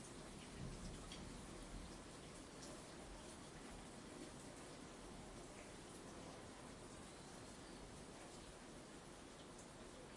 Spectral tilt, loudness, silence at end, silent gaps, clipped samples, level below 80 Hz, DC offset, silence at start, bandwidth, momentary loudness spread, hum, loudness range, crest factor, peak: -4 dB/octave; -56 LUFS; 0 s; none; under 0.1%; -64 dBFS; under 0.1%; 0 s; 11.5 kHz; 4 LU; none; 2 LU; 16 dB; -40 dBFS